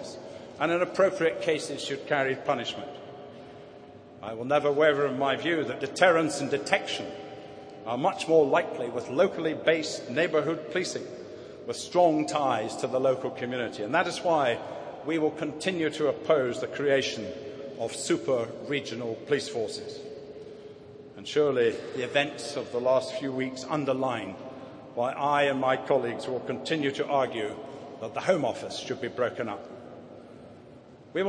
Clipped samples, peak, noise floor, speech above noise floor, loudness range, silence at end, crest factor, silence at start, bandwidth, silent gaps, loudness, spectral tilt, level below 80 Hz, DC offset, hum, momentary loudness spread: under 0.1%; -6 dBFS; -50 dBFS; 23 dB; 5 LU; 0 s; 24 dB; 0 s; 10.5 kHz; none; -28 LUFS; -4.5 dB/octave; -70 dBFS; under 0.1%; none; 19 LU